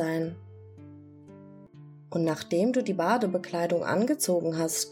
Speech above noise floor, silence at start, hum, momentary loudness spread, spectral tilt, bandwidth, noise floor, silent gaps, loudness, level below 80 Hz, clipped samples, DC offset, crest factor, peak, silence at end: 22 dB; 0 s; none; 23 LU; -4.5 dB/octave; 18 kHz; -49 dBFS; none; -28 LUFS; -76 dBFS; under 0.1%; under 0.1%; 18 dB; -12 dBFS; 0 s